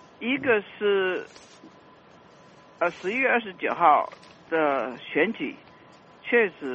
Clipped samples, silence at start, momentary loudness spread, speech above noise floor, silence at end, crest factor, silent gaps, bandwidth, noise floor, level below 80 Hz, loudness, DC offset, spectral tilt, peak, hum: under 0.1%; 0.2 s; 13 LU; 27 dB; 0 s; 20 dB; none; 8.2 kHz; -52 dBFS; -72 dBFS; -25 LUFS; under 0.1%; -5.5 dB/octave; -6 dBFS; none